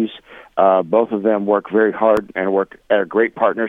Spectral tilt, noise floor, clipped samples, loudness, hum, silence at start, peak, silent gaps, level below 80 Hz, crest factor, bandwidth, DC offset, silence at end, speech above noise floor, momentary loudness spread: -7.5 dB/octave; -40 dBFS; under 0.1%; -17 LUFS; none; 0 s; 0 dBFS; none; -56 dBFS; 16 dB; 7.8 kHz; under 0.1%; 0 s; 23 dB; 5 LU